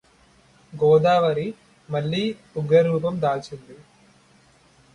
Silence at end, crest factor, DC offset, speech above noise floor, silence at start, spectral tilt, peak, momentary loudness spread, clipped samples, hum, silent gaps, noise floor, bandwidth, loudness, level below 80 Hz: 1.2 s; 18 dB; under 0.1%; 35 dB; 0.75 s; -7.5 dB/octave; -6 dBFS; 16 LU; under 0.1%; none; none; -56 dBFS; 10.5 kHz; -21 LUFS; -60 dBFS